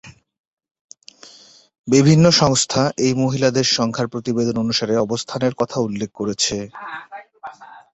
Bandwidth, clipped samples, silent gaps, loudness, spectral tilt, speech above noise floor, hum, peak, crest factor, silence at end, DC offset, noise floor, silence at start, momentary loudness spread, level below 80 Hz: 8.4 kHz; under 0.1%; 0.39-0.57 s, 0.71-0.75 s, 0.81-0.89 s, 1.79-1.84 s; -18 LUFS; -4.5 dB/octave; 29 dB; none; -2 dBFS; 18 dB; 0.15 s; under 0.1%; -47 dBFS; 0.05 s; 21 LU; -52 dBFS